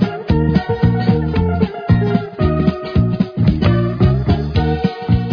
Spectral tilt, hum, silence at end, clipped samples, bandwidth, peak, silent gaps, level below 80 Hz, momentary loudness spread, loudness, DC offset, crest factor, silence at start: -10 dB/octave; none; 0 s; under 0.1%; 5.4 kHz; -2 dBFS; none; -26 dBFS; 3 LU; -16 LUFS; under 0.1%; 14 dB; 0 s